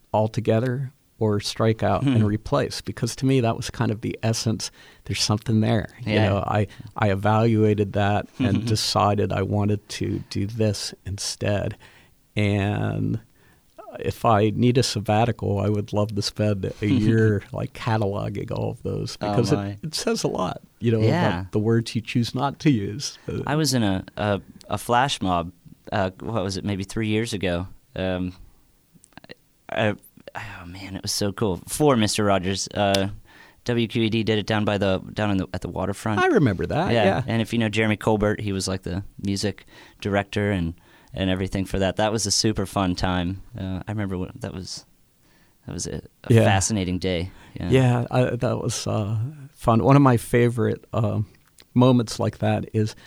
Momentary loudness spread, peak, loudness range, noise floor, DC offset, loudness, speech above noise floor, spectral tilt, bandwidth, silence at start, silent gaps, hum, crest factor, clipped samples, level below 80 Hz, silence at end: 11 LU; -2 dBFS; 6 LU; -58 dBFS; under 0.1%; -23 LUFS; 35 dB; -5.5 dB/octave; 15.5 kHz; 0.15 s; none; none; 20 dB; under 0.1%; -46 dBFS; 0.15 s